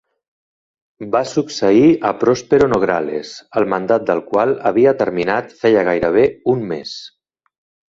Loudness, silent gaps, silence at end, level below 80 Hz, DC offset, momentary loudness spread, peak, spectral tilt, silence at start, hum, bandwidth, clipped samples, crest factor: -16 LUFS; none; 0.85 s; -52 dBFS; under 0.1%; 11 LU; -2 dBFS; -6 dB/octave; 1 s; none; 7.8 kHz; under 0.1%; 16 dB